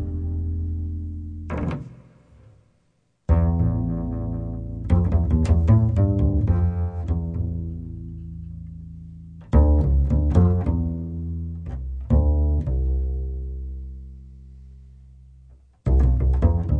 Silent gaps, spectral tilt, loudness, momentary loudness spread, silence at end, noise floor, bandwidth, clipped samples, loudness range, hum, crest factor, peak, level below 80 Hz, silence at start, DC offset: none; -10.5 dB/octave; -23 LUFS; 18 LU; 0 s; -67 dBFS; 3.4 kHz; under 0.1%; 7 LU; none; 18 dB; -4 dBFS; -26 dBFS; 0 s; under 0.1%